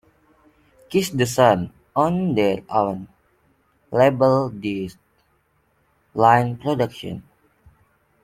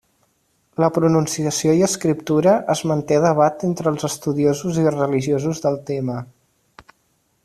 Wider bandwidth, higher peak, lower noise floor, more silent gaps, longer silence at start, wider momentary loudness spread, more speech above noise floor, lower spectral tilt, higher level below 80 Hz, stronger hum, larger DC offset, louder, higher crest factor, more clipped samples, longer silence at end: first, 16.5 kHz vs 14 kHz; about the same, -2 dBFS vs -2 dBFS; about the same, -64 dBFS vs -65 dBFS; neither; about the same, 0.9 s vs 0.8 s; first, 16 LU vs 7 LU; about the same, 45 dB vs 47 dB; about the same, -6 dB/octave vs -6 dB/octave; about the same, -56 dBFS vs -56 dBFS; neither; neither; about the same, -20 LUFS vs -19 LUFS; about the same, 20 dB vs 16 dB; neither; second, 1 s vs 1.2 s